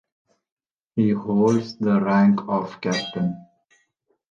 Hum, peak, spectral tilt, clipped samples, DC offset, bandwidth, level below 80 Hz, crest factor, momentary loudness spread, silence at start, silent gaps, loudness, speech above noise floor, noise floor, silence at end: none; -8 dBFS; -7 dB/octave; under 0.1%; under 0.1%; 7.6 kHz; -64 dBFS; 16 dB; 9 LU; 0.95 s; none; -22 LUFS; 50 dB; -70 dBFS; 0.85 s